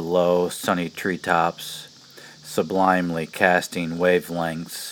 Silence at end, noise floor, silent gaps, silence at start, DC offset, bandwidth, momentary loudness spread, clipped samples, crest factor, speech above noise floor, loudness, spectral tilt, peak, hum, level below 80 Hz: 0 s; -46 dBFS; none; 0 s; under 0.1%; over 20 kHz; 13 LU; under 0.1%; 22 dB; 24 dB; -22 LUFS; -4.5 dB/octave; 0 dBFS; none; -60 dBFS